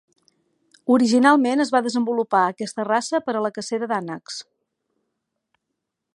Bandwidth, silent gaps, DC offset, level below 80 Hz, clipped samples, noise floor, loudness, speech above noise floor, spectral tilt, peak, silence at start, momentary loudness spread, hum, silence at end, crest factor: 11 kHz; none; under 0.1%; -74 dBFS; under 0.1%; -80 dBFS; -20 LUFS; 60 dB; -4.5 dB/octave; -2 dBFS; 0.85 s; 16 LU; none; 1.75 s; 20 dB